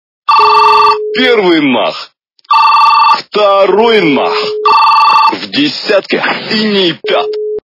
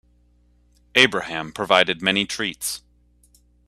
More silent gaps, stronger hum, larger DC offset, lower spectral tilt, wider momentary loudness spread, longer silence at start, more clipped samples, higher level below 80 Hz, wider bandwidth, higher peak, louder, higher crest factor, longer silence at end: neither; second, none vs 60 Hz at -55 dBFS; neither; first, -5 dB/octave vs -2.5 dB/octave; second, 7 LU vs 12 LU; second, 0.3 s vs 0.95 s; first, 1% vs under 0.1%; about the same, -54 dBFS vs -56 dBFS; second, 6 kHz vs 15.5 kHz; about the same, 0 dBFS vs 0 dBFS; first, -8 LUFS vs -20 LUFS; second, 8 dB vs 24 dB; second, 0.1 s vs 0.9 s